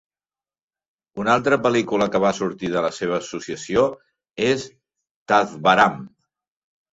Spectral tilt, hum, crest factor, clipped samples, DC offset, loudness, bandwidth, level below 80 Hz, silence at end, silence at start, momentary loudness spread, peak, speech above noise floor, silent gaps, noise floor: -5 dB/octave; none; 20 dB; under 0.1%; under 0.1%; -20 LUFS; 8 kHz; -58 dBFS; 0.85 s; 1.15 s; 13 LU; -2 dBFS; over 70 dB; 5.11-5.26 s; under -90 dBFS